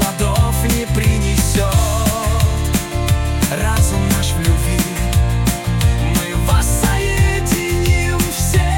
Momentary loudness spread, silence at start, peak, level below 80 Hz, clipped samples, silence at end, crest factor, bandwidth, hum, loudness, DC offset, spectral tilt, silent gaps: 3 LU; 0 s; -2 dBFS; -20 dBFS; under 0.1%; 0 s; 12 dB; 17.5 kHz; none; -16 LUFS; under 0.1%; -5 dB/octave; none